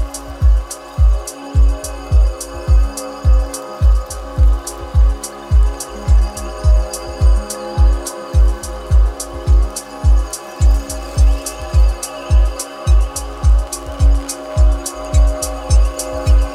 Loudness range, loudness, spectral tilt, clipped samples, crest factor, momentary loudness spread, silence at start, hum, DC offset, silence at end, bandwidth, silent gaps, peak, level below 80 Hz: 1 LU; -17 LUFS; -5.5 dB/octave; under 0.1%; 12 dB; 7 LU; 0 s; none; under 0.1%; 0 s; 13 kHz; none; -2 dBFS; -14 dBFS